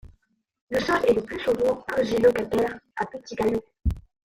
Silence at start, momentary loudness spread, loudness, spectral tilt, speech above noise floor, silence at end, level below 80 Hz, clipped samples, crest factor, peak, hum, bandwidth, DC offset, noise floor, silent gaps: 0.05 s; 11 LU; -25 LUFS; -6 dB/octave; 42 dB; 0.3 s; -40 dBFS; under 0.1%; 18 dB; -8 dBFS; none; 15.5 kHz; under 0.1%; -66 dBFS; 0.61-0.67 s